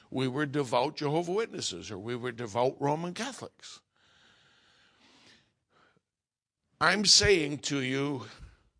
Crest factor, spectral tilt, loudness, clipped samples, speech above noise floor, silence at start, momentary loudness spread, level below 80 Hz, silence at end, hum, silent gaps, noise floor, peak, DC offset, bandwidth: 22 dB; -3 dB/octave; -28 LUFS; under 0.1%; over 61 dB; 0.1 s; 19 LU; -56 dBFS; 0.35 s; none; none; under -90 dBFS; -8 dBFS; under 0.1%; 10.5 kHz